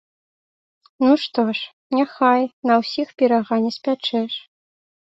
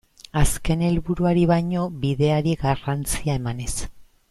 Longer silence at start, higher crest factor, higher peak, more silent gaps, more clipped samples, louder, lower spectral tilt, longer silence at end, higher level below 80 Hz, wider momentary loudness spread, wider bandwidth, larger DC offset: first, 1 s vs 0.35 s; about the same, 16 dB vs 18 dB; about the same, -4 dBFS vs -4 dBFS; first, 1.73-1.90 s, 2.53-2.62 s vs none; neither; first, -20 LUFS vs -23 LUFS; about the same, -5.5 dB/octave vs -6 dB/octave; first, 0.7 s vs 0.25 s; second, -68 dBFS vs -32 dBFS; about the same, 7 LU vs 9 LU; second, 7.8 kHz vs 13.5 kHz; neither